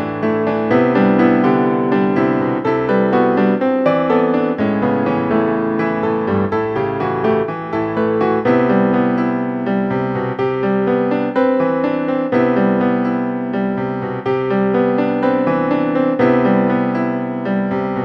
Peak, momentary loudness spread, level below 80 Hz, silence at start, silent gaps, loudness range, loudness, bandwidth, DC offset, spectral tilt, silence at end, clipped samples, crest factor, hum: 0 dBFS; 5 LU; -50 dBFS; 0 s; none; 3 LU; -16 LUFS; 6 kHz; under 0.1%; -9.5 dB/octave; 0 s; under 0.1%; 16 dB; none